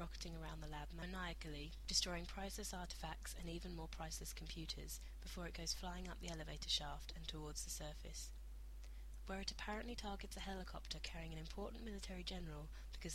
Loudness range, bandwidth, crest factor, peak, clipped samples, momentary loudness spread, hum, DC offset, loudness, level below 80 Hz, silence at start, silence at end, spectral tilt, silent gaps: 4 LU; 16 kHz; 24 dB; -24 dBFS; under 0.1%; 11 LU; none; under 0.1%; -48 LUFS; -52 dBFS; 0 s; 0 s; -3 dB/octave; none